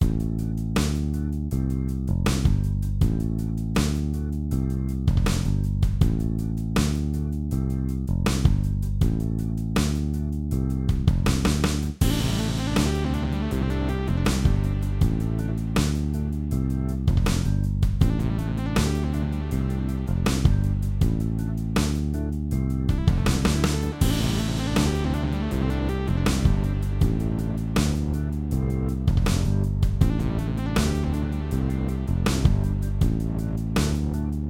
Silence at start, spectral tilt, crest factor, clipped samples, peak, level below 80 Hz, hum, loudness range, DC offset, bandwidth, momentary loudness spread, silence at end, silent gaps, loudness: 0 s; -6.5 dB/octave; 18 dB; under 0.1%; -4 dBFS; -28 dBFS; none; 1 LU; under 0.1%; 16.5 kHz; 5 LU; 0 s; none; -25 LUFS